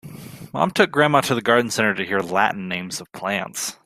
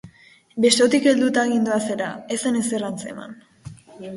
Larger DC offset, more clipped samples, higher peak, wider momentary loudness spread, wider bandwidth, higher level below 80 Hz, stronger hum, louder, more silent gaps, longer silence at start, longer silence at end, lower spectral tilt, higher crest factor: neither; neither; about the same, -2 dBFS vs -4 dBFS; second, 13 LU vs 21 LU; first, 16 kHz vs 11.5 kHz; about the same, -60 dBFS vs -62 dBFS; neither; about the same, -20 LUFS vs -20 LUFS; neither; about the same, 0.05 s vs 0.05 s; first, 0.15 s vs 0 s; about the same, -4 dB/octave vs -3.5 dB/octave; about the same, 20 dB vs 18 dB